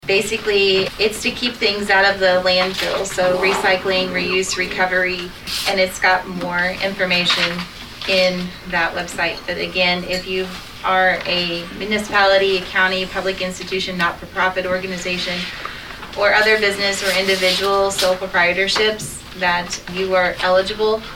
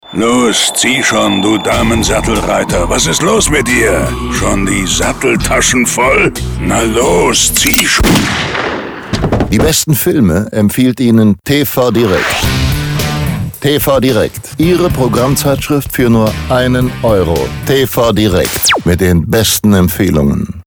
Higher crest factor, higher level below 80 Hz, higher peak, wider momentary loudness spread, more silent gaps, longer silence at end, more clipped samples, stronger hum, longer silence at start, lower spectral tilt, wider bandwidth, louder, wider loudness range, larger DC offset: first, 16 dB vs 10 dB; second, -44 dBFS vs -24 dBFS; about the same, -2 dBFS vs 0 dBFS; first, 9 LU vs 5 LU; neither; about the same, 0 s vs 0.05 s; neither; neither; about the same, 0.05 s vs 0.05 s; about the same, -3 dB/octave vs -4 dB/octave; second, 18 kHz vs over 20 kHz; second, -17 LUFS vs -10 LUFS; about the same, 3 LU vs 2 LU; neither